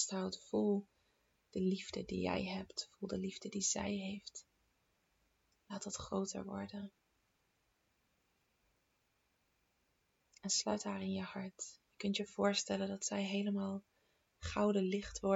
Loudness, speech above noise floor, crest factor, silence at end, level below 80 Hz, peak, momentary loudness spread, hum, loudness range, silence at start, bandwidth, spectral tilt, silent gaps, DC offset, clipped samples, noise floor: -40 LUFS; 41 dB; 20 dB; 0 s; -66 dBFS; -20 dBFS; 13 LU; none; 9 LU; 0 s; 8.2 kHz; -4 dB/octave; none; under 0.1%; under 0.1%; -80 dBFS